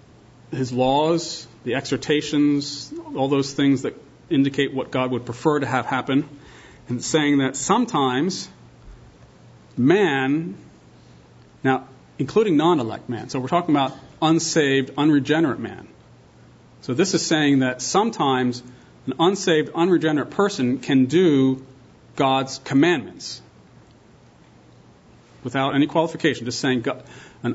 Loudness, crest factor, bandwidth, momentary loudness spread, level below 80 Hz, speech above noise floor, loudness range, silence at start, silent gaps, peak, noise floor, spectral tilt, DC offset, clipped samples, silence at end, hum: -21 LUFS; 18 dB; 8 kHz; 13 LU; -58 dBFS; 30 dB; 5 LU; 0.5 s; none; -4 dBFS; -51 dBFS; -5 dB/octave; under 0.1%; under 0.1%; 0 s; none